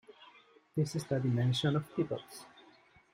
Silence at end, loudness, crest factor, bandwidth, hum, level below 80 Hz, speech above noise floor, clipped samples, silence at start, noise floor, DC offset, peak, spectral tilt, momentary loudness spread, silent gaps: 0.65 s; -34 LUFS; 16 dB; 15.5 kHz; none; -68 dBFS; 30 dB; under 0.1%; 0.2 s; -63 dBFS; under 0.1%; -18 dBFS; -6.5 dB/octave; 12 LU; none